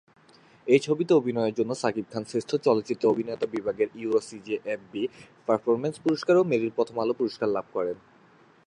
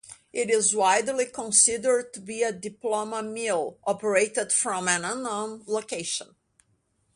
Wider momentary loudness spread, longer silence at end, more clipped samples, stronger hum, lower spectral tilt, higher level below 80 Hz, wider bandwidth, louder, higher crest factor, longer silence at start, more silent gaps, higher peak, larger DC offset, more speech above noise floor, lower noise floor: about the same, 10 LU vs 11 LU; second, 0.7 s vs 0.9 s; neither; neither; first, -6 dB/octave vs -1.5 dB/octave; about the same, -70 dBFS vs -70 dBFS; about the same, 10.5 kHz vs 11.5 kHz; about the same, -27 LUFS vs -25 LUFS; about the same, 20 dB vs 22 dB; first, 0.65 s vs 0.1 s; neither; about the same, -8 dBFS vs -6 dBFS; neither; second, 31 dB vs 44 dB; second, -57 dBFS vs -70 dBFS